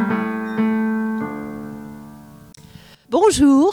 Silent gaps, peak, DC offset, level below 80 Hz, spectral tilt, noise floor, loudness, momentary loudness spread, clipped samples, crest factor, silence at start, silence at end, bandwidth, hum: none; -4 dBFS; under 0.1%; -46 dBFS; -5 dB/octave; -44 dBFS; -19 LUFS; 22 LU; under 0.1%; 16 dB; 0 s; 0 s; 15 kHz; none